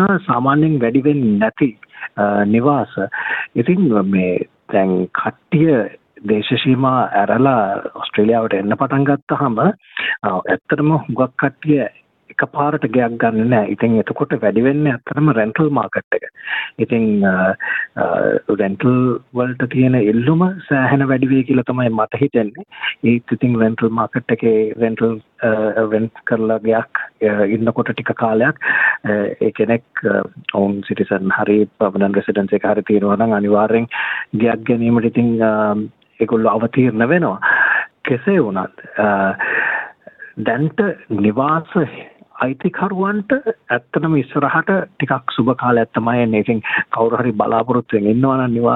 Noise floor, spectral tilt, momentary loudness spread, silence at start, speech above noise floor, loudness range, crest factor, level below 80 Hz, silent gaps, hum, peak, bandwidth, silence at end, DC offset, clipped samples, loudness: -39 dBFS; -10 dB/octave; 6 LU; 0 s; 23 dB; 2 LU; 14 dB; -54 dBFS; 9.22-9.27 s, 16.04-16.11 s; none; -2 dBFS; 4.1 kHz; 0 s; under 0.1%; under 0.1%; -16 LUFS